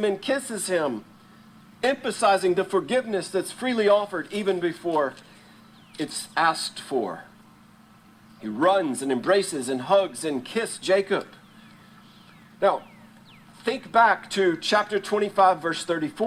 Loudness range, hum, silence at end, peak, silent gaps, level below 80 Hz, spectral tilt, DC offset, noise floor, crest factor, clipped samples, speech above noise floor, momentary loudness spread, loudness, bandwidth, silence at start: 5 LU; none; 0 s; -6 dBFS; none; -70 dBFS; -3.5 dB/octave; under 0.1%; -53 dBFS; 18 dB; under 0.1%; 29 dB; 10 LU; -24 LUFS; 15.5 kHz; 0 s